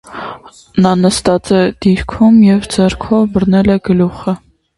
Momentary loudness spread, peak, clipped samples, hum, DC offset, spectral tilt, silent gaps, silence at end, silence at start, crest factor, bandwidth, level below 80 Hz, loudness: 12 LU; 0 dBFS; under 0.1%; none; under 0.1%; -6.5 dB/octave; none; 0.4 s; 0.1 s; 12 dB; 11.5 kHz; -34 dBFS; -12 LUFS